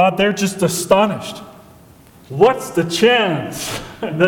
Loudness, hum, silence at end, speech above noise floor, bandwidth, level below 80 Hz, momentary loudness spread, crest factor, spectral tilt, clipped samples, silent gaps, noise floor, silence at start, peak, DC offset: -17 LUFS; none; 0 s; 28 dB; 19 kHz; -50 dBFS; 13 LU; 16 dB; -4.5 dB/octave; under 0.1%; none; -45 dBFS; 0 s; 0 dBFS; under 0.1%